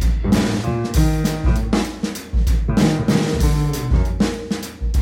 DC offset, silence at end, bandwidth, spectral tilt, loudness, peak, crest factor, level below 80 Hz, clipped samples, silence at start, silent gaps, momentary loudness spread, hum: under 0.1%; 0 s; 16.5 kHz; -6 dB/octave; -19 LUFS; -4 dBFS; 14 dB; -22 dBFS; under 0.1%; 0 s; none; 7 LU; none